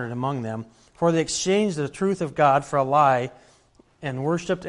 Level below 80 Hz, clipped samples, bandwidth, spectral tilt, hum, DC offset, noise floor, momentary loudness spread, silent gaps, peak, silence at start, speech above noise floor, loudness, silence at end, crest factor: -58 dBFS; under 0.1%; 11.5 kHz; -5 dB/octave; none; under 0.1%; -58 dBFS; 14 LU; none; -6 dBFS; 0 s; 35 dB; -23 LUFS; 0 s; 18 dB